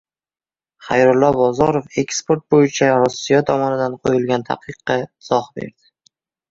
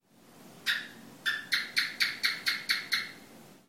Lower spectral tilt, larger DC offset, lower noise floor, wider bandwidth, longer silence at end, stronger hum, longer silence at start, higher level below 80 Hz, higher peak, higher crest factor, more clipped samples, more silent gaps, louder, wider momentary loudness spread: first, -5.5 dB/octave vs 0.5 dB/octave; neither; first, under -90 dBFS vs -56 dBFS; second, 7.8 kHz vs 16.5 kHz; first, 0.8 s vs 0.1 s; neither; first, 0.8 s vs 0.3 s; first, -52 dBFS vs -80 dBFS; first, -2 dBFS vs -10 dBFS; second, 16 dB vs 24 dB; neither; neither; first, -17 LUFS vs -30 LUFS; about the same, 9 LU vs 9 LU